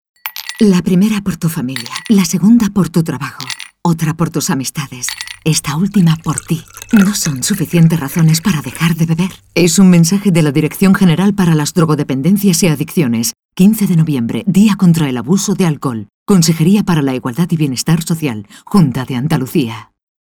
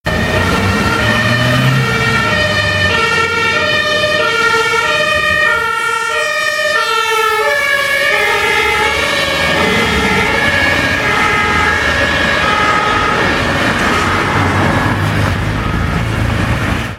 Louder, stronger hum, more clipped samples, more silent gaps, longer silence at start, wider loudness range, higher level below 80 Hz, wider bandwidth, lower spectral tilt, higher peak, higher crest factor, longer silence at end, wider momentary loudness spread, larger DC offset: about the same, -13 LUFS vs -12 LUFS; neither; neither; first, 13.45-13.49 s, 16.14-16.26 s vs none; first, 0.25 s vs 0.05 s; first, 4 LU vs 1 LU; second, -44 dBFS vs -30 dBFS; first, 19 kHz vs 16.5 kHz; first, -5.5 dB/octave vs -4 dB/octave; about the same, 0 dBFS vs 0 dBFS; about the same, 12 dB vs 12 dB; first, 0.4 s vs 0 s; first, 10 LU vs 3 LU; neither